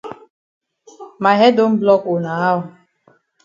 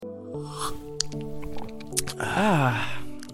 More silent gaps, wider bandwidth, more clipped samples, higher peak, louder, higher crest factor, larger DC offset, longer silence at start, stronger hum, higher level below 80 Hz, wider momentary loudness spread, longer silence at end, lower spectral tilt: first, 0.30-0.61 s vs none; second, 7.4 kHz vs 16.5 kHz; neither; about the same, 0 dBFS vs -2 dBFS; first, -15 LUFS vs -28 LUFS; second, 18 dB vs 26 dB; neither; about the same, 0.05 s vs 0 s; neither; second, -64 dBFS vs -46 dBFS; about the same, 13 LU vs 15 LU; first, 0.75 s vs 0 s; first, -7 dB/octave vs -4 dB/octave